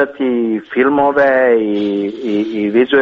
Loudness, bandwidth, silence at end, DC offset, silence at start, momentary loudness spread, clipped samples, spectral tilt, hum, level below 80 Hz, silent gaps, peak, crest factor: -14 LUFS; 6.8 kHz; 0 s; under 0.1%; 0 s; 7 LU; under 0.1%; -7.5 dB/octave; none; -54 dBFS; none; -2 dBFS; 12 dB